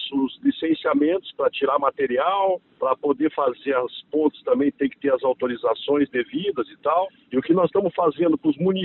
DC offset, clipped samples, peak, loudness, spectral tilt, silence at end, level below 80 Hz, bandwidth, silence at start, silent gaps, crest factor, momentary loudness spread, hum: under 0.1%; under 0.1%; -6 dBFS; -22 LUFS; -10.5 dB/octave; 0 s; -64 dBFS; 4.2 kHz; 0 s; none; 16 dB; 5 LU; none